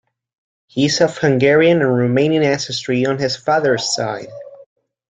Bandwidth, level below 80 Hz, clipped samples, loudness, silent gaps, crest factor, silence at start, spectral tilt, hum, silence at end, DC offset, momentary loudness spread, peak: 9.4 kHz; -56 dBFS; under 0.1%; -16 LUFS; none; 16 dB; 0.75 s; -5 dB/octave; none; 0.45 s; under 0.1%; 12 LU; -2 dBFS